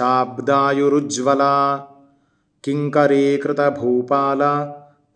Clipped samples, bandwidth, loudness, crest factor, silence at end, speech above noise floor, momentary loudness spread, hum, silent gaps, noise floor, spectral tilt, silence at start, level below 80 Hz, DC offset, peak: under 0.1%; 10 kHz; -18 LUFS; 18 dB; 0.35 s; 46 dB; 8 LU; none; none; -63 dBFS; -5.5 dB/octave; 0 s; -70 dBFS; under 0.1%; -2 dBFS